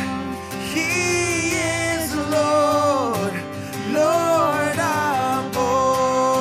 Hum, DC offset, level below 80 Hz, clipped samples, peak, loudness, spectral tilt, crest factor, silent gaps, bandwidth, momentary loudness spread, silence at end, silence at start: none; under 0.1%; -48 dBFS; under 0.1%; -6 dBFS; -20 LUFS; -4 dB/octave; 14 dB; none; 16 kHz; 9 LU; 0 s; 0 s